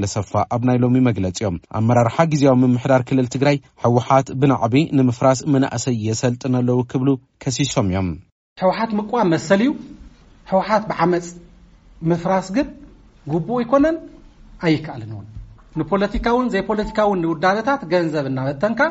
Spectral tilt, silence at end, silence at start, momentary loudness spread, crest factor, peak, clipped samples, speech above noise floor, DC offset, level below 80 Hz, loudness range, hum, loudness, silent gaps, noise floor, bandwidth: -6.5 dB/octave; 0 s; 0 s; 9 LU; 16 dB; -2 dBFS; under 0.1%; 29 dB; under 0.1%; -44 dBFS; 5 LU; none; -19 LUFS; 8.32-8.56 s; -47 dBFS; 8 kHz